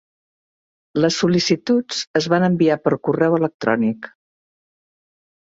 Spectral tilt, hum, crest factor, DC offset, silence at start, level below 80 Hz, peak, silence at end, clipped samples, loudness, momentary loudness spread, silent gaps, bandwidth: -5.5 dB/octave; none; 18 dB; under 0.1%; 0.95 s; -60 dBFS; -2 dBFS; 1.35 s; under 0.1%; -19 LUFS; 6 LU; 2.07-2.14 s, 3.54-3.59 s; 7.8 kHz